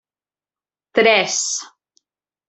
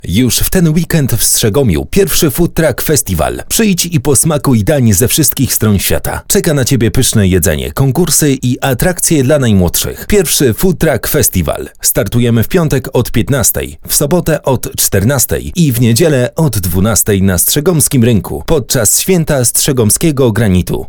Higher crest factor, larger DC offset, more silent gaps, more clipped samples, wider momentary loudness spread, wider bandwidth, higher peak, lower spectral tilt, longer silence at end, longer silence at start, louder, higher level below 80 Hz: first, 20 dB vs 10 dB; second, under 0.1% vs 0.6%; neither; neither; first, 9 LU vs 4 LU; second, 8.4 kHz vs 19 kHz; about the same, -2 dBFS vs 0 dBFS; second, -1 dB/octave vs -4.5 dB/octave; first, 0.8 s vs 0 s; first, 0.95 s vs 0.05 s; second, -17 LUFS vs -10 LUFS; second, -68 dBFS vs -26 dBFS